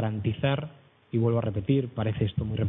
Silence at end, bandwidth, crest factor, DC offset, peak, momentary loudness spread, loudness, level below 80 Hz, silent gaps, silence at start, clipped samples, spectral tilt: 0 s; 3.9 kHz; 16 dB; under 0.1%; -12 dBFS; 6 LU; -28 LUFS; -50 dBFS; none; 0 s; under 0.1%; -12 dB/octave